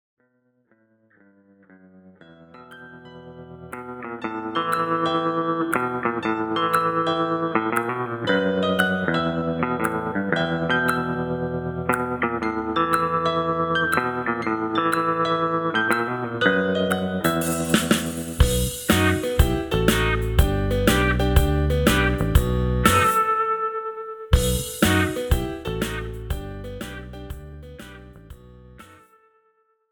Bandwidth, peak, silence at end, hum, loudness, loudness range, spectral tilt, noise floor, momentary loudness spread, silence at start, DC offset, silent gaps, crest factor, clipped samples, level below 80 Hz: over 20 kHz; -2 dBFS; 1.05 s; none; -22 LUFS; 10 LU; -5 dB/octave; -66 dBFS; 15 LU; 2.05 s; under 0.1%; none; 20 dB; under 0.1%; -32 dBFS